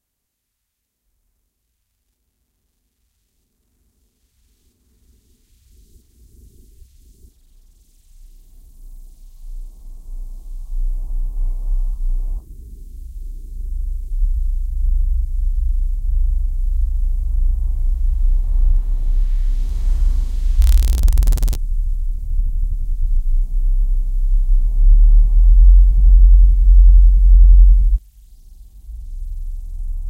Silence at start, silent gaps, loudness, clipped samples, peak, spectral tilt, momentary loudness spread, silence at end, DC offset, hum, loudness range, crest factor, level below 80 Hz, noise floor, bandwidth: 8.8 s; none; -19 LUFS; under 0.1%; 0 dBFS; -6.5 dB/octave; 23 LU; 0 s; under 0.1%; none; 16 LU; 14 dB; -14 dBFS; -75 dBFS; 0.9 kHz